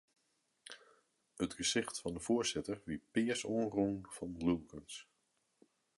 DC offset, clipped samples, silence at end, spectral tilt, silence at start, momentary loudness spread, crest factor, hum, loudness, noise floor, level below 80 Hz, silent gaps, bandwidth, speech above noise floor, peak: under 0.1%; under 0.1%; 0.95 s; -4 dB/octave; 0.65 s; 16 LU; 20 dB; none; -38 LUFS; -81 dBFS; -64 dBFS; none; 11.5 kHz; 43 dB; -20 dBFS